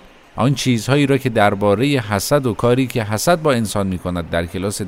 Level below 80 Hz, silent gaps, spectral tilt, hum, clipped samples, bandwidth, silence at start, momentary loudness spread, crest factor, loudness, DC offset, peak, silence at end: -42 dBFS; none; -5.5 dB/octave; none; under 0.1%; 16 kHz; 0.05 s; 6 LU; 18 dB; -17 LUFS; under 0.1%; 0 dBFS; 0 s